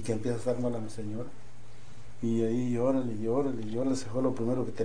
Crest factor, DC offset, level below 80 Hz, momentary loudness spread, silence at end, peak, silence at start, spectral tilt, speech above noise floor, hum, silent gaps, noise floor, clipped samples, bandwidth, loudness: 16 dB; 2%; -58 dBFS; 10 LU; 0 s; -16 dBFS; 0 s; -7.5 dB/octave; 22 dB; none; none; -52 dBFS; under 0.1%; 10 kHz; -31 LUFS